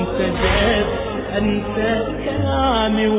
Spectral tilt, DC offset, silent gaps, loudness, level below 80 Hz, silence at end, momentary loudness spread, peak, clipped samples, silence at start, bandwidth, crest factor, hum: -10 dB/octave; under 0.1%; none; -19 LUFS; -30 dBFS; 0 s; 6 LU; -4 dBFS; under 0.1%; 0 s; 4 kHz; 14 dB; none